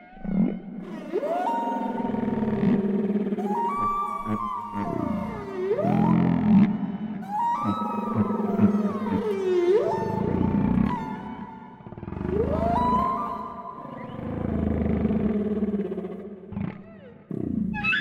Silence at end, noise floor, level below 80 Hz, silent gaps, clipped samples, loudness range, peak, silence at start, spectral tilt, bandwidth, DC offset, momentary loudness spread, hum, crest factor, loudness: 0 s; -46 dBFS; -44 dBFS; none; under 0.1%; 4 LU; -8 dBFS; 0 s; -9 dB/octave; 7 kHz; under 0.1%; 15 LU; none; 18 dB; -26 LUFS